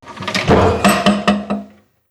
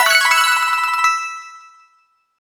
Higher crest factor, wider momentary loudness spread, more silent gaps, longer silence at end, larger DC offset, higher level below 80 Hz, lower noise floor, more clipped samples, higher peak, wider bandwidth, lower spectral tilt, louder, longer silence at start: about the same, 14 dB vs 16 dB; second, 10 LU vs 14 LU; neither; second, 0.45 s vs 0.9 s; neither; first, -34 dBFS vs -66 dBFS; second, -40 dBFS vs -60 dBFS; neither; about the same, 0 dBFS vs -2 dBFS; second, 13.5 kHz vs over 20 kHz; first, -5 dB/octave vs 3.5 dB/octave; about the same, -15 LUFS vs -14 LUFS; about the same, 0.05 s vs 0 s